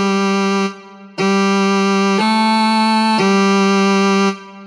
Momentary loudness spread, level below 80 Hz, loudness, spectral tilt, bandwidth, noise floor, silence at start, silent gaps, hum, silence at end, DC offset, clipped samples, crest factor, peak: 6 LU; -76 dBFS; -14 LUFS; -5 dB/octave; 11 kHz; -34 dBFS; 0 s; none; none; 0 s; under 0.1%; under 0.1%; 10 dB; -4 dBFS